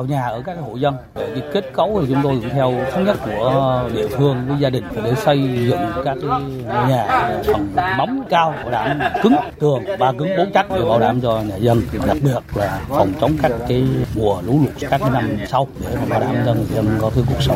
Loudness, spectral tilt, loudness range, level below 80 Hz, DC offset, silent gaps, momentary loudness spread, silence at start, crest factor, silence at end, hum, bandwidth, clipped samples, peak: -18 LUFS; -7.5 dB/octave; 2 LU; -36 dBFS; under 0.1%; none; 5 LU; 0 s; 16 dB; 0 s; none; 16 kHz; under 0.1%; 0 dBFS